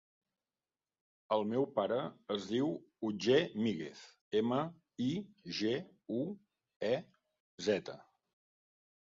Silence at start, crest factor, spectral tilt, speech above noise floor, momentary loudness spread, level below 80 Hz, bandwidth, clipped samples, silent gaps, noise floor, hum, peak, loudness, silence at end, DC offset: 1.3 s; 20 dB; -4.5 dB/octave; over 55 dB; 12 LU; -78 dBFS; 7.4 kHz; under 0.1%; 4.21-4.31 s, 6.76-6.80 s, 7.40-7.58 s; under -90 dBFS; none; -16 dBFS; -36 LUFS; 1 s; under 0.1%